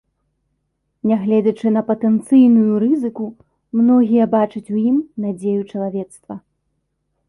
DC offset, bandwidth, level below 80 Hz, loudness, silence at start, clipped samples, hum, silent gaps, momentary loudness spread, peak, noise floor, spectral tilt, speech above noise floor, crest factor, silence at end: under 0.1%; 11.5 kHz; -62 dBFS; -16 LUFS; 1.05 s; under 0.1%; none; none; 16 LU; -2 dBFS; -71 dBFS; -9 dB/octave; 55 dB; 14 dB; 0.9 s